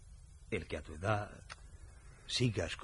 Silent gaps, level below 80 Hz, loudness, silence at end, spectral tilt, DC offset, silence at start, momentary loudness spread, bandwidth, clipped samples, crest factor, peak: none; -54 dBFS; -38 LUFS; 0 s; -5 dB/octave; under 0.1%; 0 s; 23 LU; 11.5 kHz; under 0.1%; 22 dB; -18 dBFS